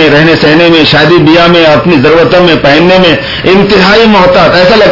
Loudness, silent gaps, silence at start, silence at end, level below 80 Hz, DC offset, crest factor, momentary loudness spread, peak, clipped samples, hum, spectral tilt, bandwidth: -3 LUFS; none; 0 s; 0 s; -28 dBFS; under 0.1%; 4 dB; 2 LU; 0 dBFS; 20%; none; -6 dB/octave; 6 kHz